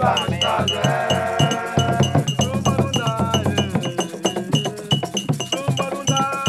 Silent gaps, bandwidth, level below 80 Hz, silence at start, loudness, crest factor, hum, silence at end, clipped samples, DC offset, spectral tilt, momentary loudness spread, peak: none; 14.5 kHz; -48 dBFS; 0 s; -20 LUFS; 16 dB; none; 0 s; under 0.1%; under 0.1%; -4.5 dB/octave; 4 LU; -4 dBFS